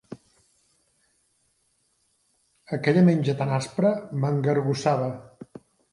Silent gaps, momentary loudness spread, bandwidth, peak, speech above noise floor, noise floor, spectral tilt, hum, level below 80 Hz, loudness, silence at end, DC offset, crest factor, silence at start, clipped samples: none; 26 LU; 11.5 kHz; -6 dBFS; 47 dB; -70 dBFS; -7.5 dB/octave; none; -66 dBFS; -24 LUFS; 0.5 s; under 0.1%; 20 dB; 0.1 s; under 0.1%